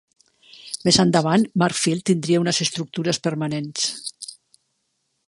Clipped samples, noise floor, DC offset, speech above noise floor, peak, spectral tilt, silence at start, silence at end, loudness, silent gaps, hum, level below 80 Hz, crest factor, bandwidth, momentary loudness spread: under 0.1%; -73 dBFS; under 0.1%; 52 dB; -2 dBFS; -4.5 dB/octave; 0.65 s; 0.95 s; -21 LUFS; none; none; -58 dBFS; 20 dB; 11.5 kHz; 15 LU